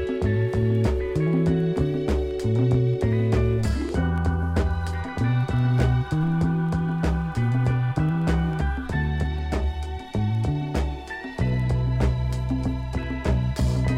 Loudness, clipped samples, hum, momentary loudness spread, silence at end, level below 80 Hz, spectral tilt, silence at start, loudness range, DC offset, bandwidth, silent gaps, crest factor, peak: -24 LUFS; under 0.1%; none; 6 LU; 0 s; -30 dBFS; -8 dB/octave; 0 s; 3 LU; under 0.1%; 11 kHz; none; 14 dB; -8 dBFS